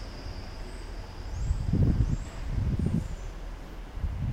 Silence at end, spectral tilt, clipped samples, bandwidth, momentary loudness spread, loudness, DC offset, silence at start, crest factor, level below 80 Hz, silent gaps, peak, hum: 0 s; -7.5 dB/octave; under 0.1%; 10.5 kHz; 16 LU; -32 LUFS; under 0.1%; 0 s; 18 dB; -34 dBFS; none; -12 dBFS; none